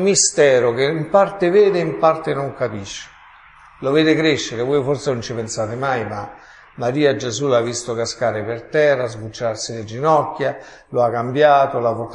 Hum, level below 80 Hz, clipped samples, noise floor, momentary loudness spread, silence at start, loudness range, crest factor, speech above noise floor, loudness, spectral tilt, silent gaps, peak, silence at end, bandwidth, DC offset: none; -54 dBFS; under 0.1%; -45 dBFS; 12 LU; 0 s; 3 LU; 18 dB; 28 dB; -18 LUFS; -4 dB/octave; none; -2 dBFS; 0 s; 10.5 kHz; under 0.1%